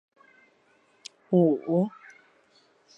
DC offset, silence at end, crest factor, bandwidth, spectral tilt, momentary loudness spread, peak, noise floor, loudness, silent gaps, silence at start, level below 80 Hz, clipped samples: under 0.1%; 1.1 s; 18 dB; 8.8 kHz; -8.5 dB/octave; 24 LU; -12 dBFS; -64 dBFS; -25 LUFS; none; 1.3 s; -78 dBFS; under 0.1%